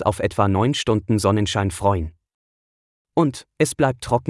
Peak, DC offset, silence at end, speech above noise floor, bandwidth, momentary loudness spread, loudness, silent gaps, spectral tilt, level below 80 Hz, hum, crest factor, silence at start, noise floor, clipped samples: -4 dBFS; under 0.1%; 0 s; over 70 dB; 12 kHz; 4 LU; -21 LUFS; 2.34-3.05 s; -5.5 dB/octave; -46 dBFS; none; 18 dB; 0 s; under -90 dBFS; under 0.1%